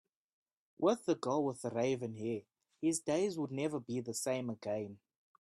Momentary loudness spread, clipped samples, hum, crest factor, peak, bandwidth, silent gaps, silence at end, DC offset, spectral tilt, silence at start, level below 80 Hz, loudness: 7 LU; under 0.1%; none; 20 dB; -18 dBFS; 13 kHz; none; 0.5 s; under 0.1%; -5 dB/octave; 0.8 s; -78 dBFS; -37 LUFS